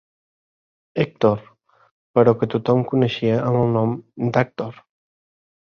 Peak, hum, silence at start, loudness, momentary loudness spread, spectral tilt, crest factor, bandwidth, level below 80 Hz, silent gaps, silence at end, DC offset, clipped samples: -2 dBFS; none; 0.95 s; -20 LUFS; 10 LU; -8.5 dB/octave; 20 dB; 6.6 kHz; -56 dBFS; 1.91-2.14 s; 0.95 s; under 0.1%; under 0.1%